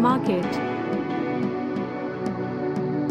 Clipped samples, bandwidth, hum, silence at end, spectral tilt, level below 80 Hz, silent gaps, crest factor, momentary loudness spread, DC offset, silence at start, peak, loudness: under 0.1%; 10 kHz; none; 0 s; -7.5 dB/octave; -60 dBFS; none; 16 dB; 5 LU; under 0.1%; 0 s; -8 dBFS; -26 LUFS